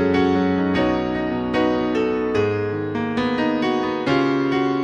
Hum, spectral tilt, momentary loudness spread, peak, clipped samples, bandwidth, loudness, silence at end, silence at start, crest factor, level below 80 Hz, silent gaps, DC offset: none; -7 dB/octave; 4 LU; -6 dBFS; under 0.1%; 8 kHz; -21 LUFS; 0 s; 0 s; 14 dB; -46 dBFS; none; under 0.1%